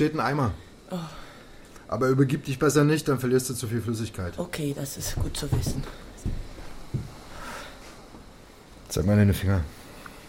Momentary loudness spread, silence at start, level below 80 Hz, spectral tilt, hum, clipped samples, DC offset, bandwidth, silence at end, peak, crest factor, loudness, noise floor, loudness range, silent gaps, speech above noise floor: 22 LU; 0 s; -40 dBFS; -6 dB/octave; none; under 0.1%; under 0.1%; 16.5 kHz; 0 s; -8 dBFS; 18 dB; -27 LUFS; -48 dBFS; 9 LU; none; 23 dB